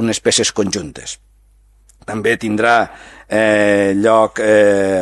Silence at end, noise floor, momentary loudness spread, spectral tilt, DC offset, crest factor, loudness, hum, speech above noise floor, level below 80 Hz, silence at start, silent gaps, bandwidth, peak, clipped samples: 0 s; -50 dBFS; 15 LU; -3.5 dB/octave; under 0.1%; 16 dB; -14 LUFS; 50 Hz at -45 dBFS; 36 dB; -48 dBFS; 0 s; none; 12.5 kHz; 0 dBFS; under 0.1%